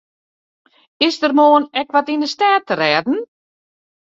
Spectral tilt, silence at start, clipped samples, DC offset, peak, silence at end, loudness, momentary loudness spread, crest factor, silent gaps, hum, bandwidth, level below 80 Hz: -4 dB/octave; 1 s; under 0.1%; under 0.1%; -2 dBFS; 0.8 s; -16 LUFS; 9 LU; 16 dB; none; none; 7.8 kHz; -66 dBFS